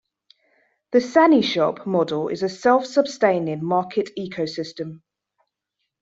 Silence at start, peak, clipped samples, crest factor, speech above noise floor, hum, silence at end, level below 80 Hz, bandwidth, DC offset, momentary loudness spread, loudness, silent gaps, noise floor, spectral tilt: 0.9 s; -2 dBFS; under 0.1%; 18 dB; 59 dB; none; 1.05 s; -66 dBFS; 7.8 kHz; under 0.1%; 13 LU; -21 LUFS; none; -79 dBFS; -5.5 dB/octave